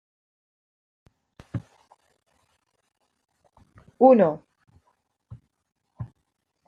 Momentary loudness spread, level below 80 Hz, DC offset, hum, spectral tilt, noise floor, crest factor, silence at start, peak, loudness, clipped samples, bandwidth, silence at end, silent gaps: 25 LU; -64 dBFS; under 0.1%; none; -10 dB/octave; -76 dBFS; 24 dB; 1.55 s; -4 dBFS; -19 LUFS; under 0.1%; 4.9 kHz; 0.6 s; none